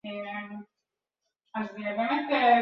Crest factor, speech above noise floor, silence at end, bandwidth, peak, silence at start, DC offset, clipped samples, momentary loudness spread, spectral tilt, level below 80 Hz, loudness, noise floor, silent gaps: 18 dB; 62 dB; 0 s; 5.8 kHz; -10 dBFS; 0.05 s; under 0.1%; under 0.1%; 17 LU; -7 dB/octave; -78 dBFS; -29 LUFS; -87 dBFS; none